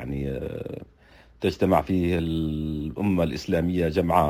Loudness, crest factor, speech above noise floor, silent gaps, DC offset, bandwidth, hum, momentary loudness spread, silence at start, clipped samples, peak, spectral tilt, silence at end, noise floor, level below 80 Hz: -26 LUFS; 20 dB; 29 dB; none; under 0.1%; 16 kHz; none; 11 LU; 0 s; under 0.1%; -6 dBFS; -7.5 dB/octave; 0 s; -53 dBFS; -40 dBFS